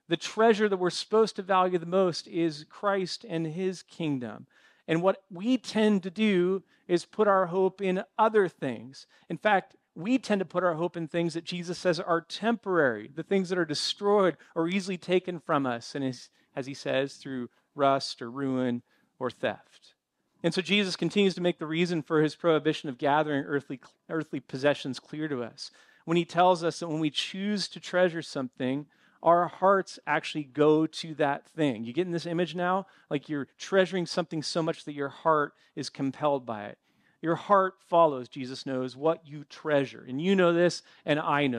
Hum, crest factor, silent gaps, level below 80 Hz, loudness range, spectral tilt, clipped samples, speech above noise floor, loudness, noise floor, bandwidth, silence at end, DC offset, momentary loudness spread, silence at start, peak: none; 20 dB; none; -80 dBFS; 4 LU; -5.5 dB/octave; under 0.1%; 45 dB; -28 LUFS; -73 dBFS; 11 kHz; 0 s; under 0.1%; 12 LU; 0.1 s; -8 dBFS